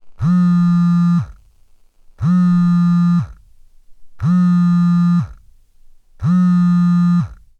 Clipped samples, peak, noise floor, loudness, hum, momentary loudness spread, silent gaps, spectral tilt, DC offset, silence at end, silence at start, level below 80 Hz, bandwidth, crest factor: under 0.1%; -8 dBFS; -48 dBFS; -15 LUFS; none; 8 LU; none; -9 dB/octave; under 0.1%; 0.25 s; 0.05 s; -44 dBFS; 4.3 kHz; 8 dB